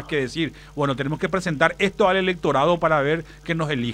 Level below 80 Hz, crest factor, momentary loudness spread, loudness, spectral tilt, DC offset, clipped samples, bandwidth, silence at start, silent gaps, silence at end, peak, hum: -46 dBFS; 20 dB; 8 LU; -22 LUFS; -6 dB/octave; under 0.1%; under 0.1%; 15 kHz; 0 s; none; 0 s; -2 dBFS; none